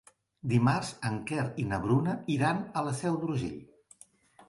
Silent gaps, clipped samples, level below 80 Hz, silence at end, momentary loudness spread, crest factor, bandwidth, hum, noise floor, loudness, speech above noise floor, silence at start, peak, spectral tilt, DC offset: none; under 0.1%; -58 dBFS; 0.05 s; 8 LU; 18 dB; 11.5 kHz; none; -59 dBFS; -31 LUFS; 29 dB; 0.45 s; -12 dBFS; -6.5 dB/octave; under 0.1%